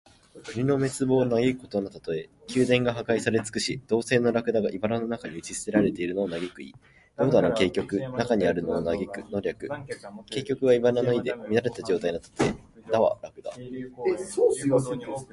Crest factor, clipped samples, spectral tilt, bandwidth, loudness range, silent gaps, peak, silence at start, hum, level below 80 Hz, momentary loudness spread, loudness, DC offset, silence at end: 20 dB; under 0.1%; -5.5 dB/octave; 11.5 kHz; 2 LU; none; -6 dBFS; 0.35 s; none; -56 dBFS; 14 LU; -26 LUFS; under 0.1%; 0.1 s